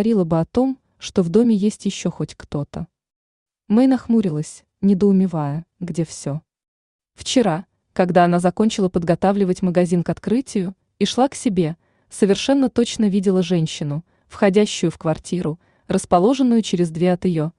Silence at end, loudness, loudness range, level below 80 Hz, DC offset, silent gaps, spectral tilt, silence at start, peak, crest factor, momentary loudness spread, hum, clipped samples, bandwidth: 0.1 s; -19 LUFS; 3 LU; -52 dBFS; under 0.1%; 3.16-3.46 s, 6.68-6.99 s; -6.5 dB/octave; 0 s; -4 dBFS; 16 dB; 12 LU; none; under 0.1%; 11 kHz